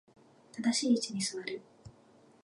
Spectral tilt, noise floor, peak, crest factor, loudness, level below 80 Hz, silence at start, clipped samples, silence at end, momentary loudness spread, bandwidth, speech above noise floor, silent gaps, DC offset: -3 dB/octave; -62 dBFS; -18 dBFS; 18 dB; -32 LUFS; -74 dBFS; 0.55 s; under 0.1%; 0.55 s; 15 LU; 11.5 kHz; 30 dB; none; under 0.1%